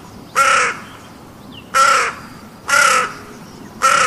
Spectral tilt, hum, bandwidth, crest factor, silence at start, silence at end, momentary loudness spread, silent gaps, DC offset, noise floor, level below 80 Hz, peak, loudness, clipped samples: -0.5 dB/octave; none; 15 kHz; 16 dB; 0.05 s; 0 s; 24 LU; none; under 0.1%; -38 dBFS; -52 dBFS; 0 dBFS; -14 LUFS; under 0.1%